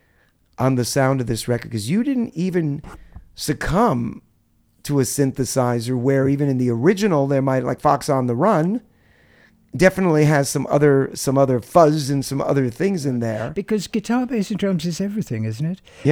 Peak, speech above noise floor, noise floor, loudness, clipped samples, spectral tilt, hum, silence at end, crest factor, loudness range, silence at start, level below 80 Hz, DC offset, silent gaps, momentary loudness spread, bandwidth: 0 dBFS; 41 dB; -60 dBFS; -20 LUFS; under 0.1%; -6 dB/octave; none; 0 s; 20 dB; 5 LU; 0.6 s; -46 dBFS; under 0.1%; none; 9 LU; 17.5 kHz